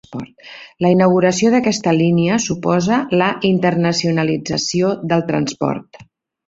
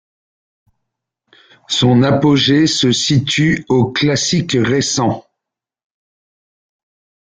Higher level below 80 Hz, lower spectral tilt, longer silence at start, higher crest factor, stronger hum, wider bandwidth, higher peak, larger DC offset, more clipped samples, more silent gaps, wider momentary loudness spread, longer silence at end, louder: second, -54 dBFS vs -48 dBFS; about the same, -5.5 dB/octave vs -4.5 dB/octave; second, 0.1 s vs 1.7 s; about the same, 14 dB vs 14 dB; neither; second, 8 kHz vs 9.6 kHz; about the same, -2 dBFS vs -2 dBFS; neither; neither; neither; first, 10 LU vs 5 LU; second, 0.45 s vs 2 s; about the same, -16 LUFS vs -14 LUFS